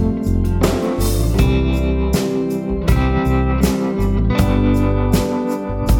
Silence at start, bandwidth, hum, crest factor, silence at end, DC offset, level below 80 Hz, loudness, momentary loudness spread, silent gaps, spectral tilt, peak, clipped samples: 0 s; 18.5 kHz; none; 14 dB; 0 s; under 0.1%; -20 dBFS; -17 LUFS; 4 LU; none; -7 dB/octave; 0 dBFS; under 0.1%